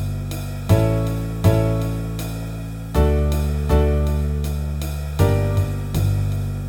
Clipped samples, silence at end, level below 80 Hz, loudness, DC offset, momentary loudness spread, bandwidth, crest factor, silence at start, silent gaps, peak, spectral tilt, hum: under 0.1%; 0 s; -24 dBFS; -21 LUFS; under 0.1%; 9 LU; 17.5 kHz; 18 dB; 0 s; none; -2 dBFS; -7.5 dB/octave; none